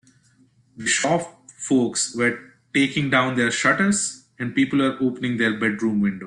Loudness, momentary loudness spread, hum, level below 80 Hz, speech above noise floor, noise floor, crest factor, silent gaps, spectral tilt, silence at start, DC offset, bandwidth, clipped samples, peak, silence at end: -21 LUFS; 9 LU; none; -62 dBFS; 37 dB; -58 dBFS; 16 dB; none; -4 dB/octave; 0.75 s; under 0.1%; 11 kHz; under 0.1%; -6 dBFS; 0 s